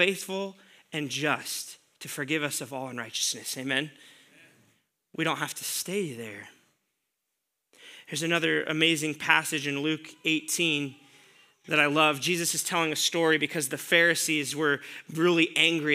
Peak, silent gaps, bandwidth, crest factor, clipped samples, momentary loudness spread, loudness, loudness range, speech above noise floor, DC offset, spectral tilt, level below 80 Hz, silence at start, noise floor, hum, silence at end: -4 dBFS; none; 16 kHz; 24 dB; under 0.1%; 14 LU; -26 LUFS; 10 LU; 55 dB; under 0.1%; -2.5 dB/octave; -86 dBFS; 0 s; -82 dBFS; none; 0 s